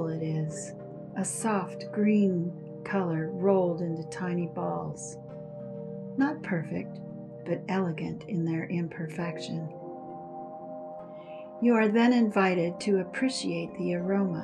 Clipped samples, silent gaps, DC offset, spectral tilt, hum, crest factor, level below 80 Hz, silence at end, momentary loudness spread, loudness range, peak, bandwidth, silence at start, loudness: under 0.1%; none; under 0.1%; -6 dB/octave; none; 18 dB; -70 dBFS; 0 s; 17 LU; 7 LU; -12 dBFS; 12.5 kHz; 0 s; -29 LUFS